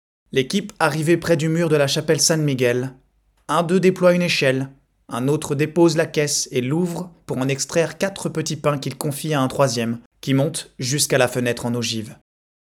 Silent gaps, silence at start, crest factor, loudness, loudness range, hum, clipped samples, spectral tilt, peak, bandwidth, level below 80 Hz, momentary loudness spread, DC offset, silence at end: 10.06-10.11 s; 0.35 s; 18 dB; -20 LUFS; 4 LU; none; under 0.1%; -4.5 dB/octave; -2 dBFS; 17.5 kHz; -58 dBFS; 9 LU; under 0.1%; 0.55 s